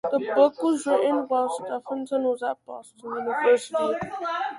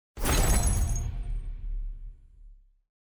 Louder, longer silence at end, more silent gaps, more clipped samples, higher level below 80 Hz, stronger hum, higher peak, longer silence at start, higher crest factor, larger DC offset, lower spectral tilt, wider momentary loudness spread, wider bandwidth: first, -25 LUFS vs -30 LUFS; second, 0 s vs 0.6 s; neither; neither; second, -68 dBFS vs -30 dBFS; neither; first, -6 dBFS vs -14 dBFS; about the same, 0.05 s vs 0.15 s; about the same, 18 dB vs 16 dB; neither; about the same, -4.5 dB/octave vs -4 dB/octave; second, 11 LU vs 19 LU; second, 11.5 kHz vs over 20 kHz